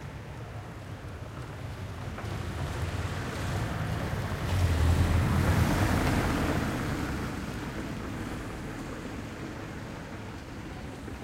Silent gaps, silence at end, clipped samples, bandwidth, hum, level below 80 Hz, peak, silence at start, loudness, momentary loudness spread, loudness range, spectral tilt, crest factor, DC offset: none; 0 s; under 0.1%; 16 kHz; none; -38 dBFS; -14 dBFS; 0 s; -32 LUFS; 15 LU; 10 LU; -6 dB/octave; 18 dB; under 0.1%